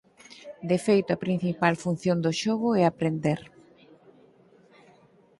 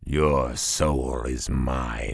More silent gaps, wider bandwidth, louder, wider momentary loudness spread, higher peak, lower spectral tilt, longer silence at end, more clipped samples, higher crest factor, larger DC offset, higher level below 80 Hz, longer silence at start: neither; about the same, 11.5 kHz vs 11 kHz; about the same, -26 LUFS vs -25 LUFS; first, 10 LU vs 6 LU; about the same, -6 dBFS vs -6 dBFS; first, -6.5 dB/octave vs -4.5 dB/octave; first, 1.95 s vs 0 s; neither; about the same, 22 dB vs 18 dB; neither; second, -66 dBFS vs -30 dBFS; first, 0.3 s vs 0 s